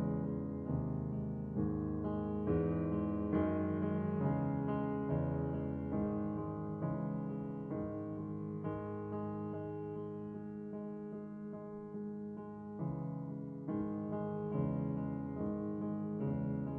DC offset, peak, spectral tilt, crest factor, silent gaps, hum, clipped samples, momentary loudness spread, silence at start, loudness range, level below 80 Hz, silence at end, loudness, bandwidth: under 0.1%; -22 dBFS; -12 dB/octave; 16 dB; none; none; under 0.1%; 9 LU; 0 s; 8 LU; -58 dBFS; 0 s; -39 LUFS; 3.4 kHz